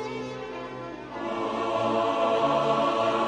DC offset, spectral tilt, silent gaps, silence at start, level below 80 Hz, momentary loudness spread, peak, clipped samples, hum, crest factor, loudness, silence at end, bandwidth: under 0.1%; -5.5 dB/octave; none; 0 s; -60 dBFS; 13 LU; -12 dBFS; under 0.1%; none; 14 dB; -27 LUFS; 0 s; 10 kHz